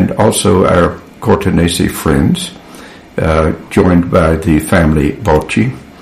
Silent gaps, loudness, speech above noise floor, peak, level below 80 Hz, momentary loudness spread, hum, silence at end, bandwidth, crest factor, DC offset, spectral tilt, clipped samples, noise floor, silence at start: none; -12 LUFS; 23 dB; 0 dBFS; -26 dBFS; 7 LU; none; 0 s; 15.5 kHz; 12 dB; 0.5%; -6 dB/octave; under 0.1%; -33 dBFS; 0 s